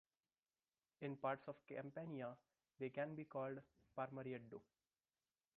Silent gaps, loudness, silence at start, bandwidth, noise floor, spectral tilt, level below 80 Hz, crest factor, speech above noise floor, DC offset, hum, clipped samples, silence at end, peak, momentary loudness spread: none; -51 LUFS; 1 s; 4.5 kHz; under -90 dBFS; -6 dB/octave; -90 dBFS; 22 dB; over 40 dB; under 0.1%; none; under 0.1%; 0.95 s; -30 dBFS; 11 LU